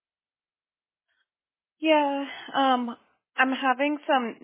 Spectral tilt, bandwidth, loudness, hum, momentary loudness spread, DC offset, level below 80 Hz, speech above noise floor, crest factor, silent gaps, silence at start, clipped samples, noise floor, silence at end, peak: -7 dB/octave; 3.8 kHz; -25 LUFS; none; 9 LU; under 0.1%; -86 dBFS; over 65 dB; 20 dB; none; 1.8 s; under 0.1%; under -90 dBFS; 0.1 s; -8 dBFS